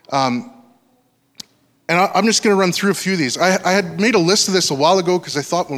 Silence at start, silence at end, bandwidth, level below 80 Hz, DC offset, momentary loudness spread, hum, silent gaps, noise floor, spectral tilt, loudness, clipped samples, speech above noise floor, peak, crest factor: 0.1 s; 0 s; 16 kHz; -64 dBFS; under 0.1%; 6 LU; none; none; -60 dBFS; -3.5 dB/octave; -16 LUFS; under 0.1%; 44 dB; -2 dBFS; 16 dB